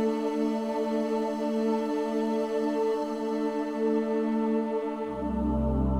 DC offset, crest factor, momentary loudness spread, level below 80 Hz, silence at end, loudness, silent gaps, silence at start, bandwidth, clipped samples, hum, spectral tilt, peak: under 0.1%; 12 dB; 3 LU; -40 dBFS; 0 s; -29 LUFS; none; 0 s; 12 kHz; under 0.1%; none; -7.5 dB/octave; -16 dBFS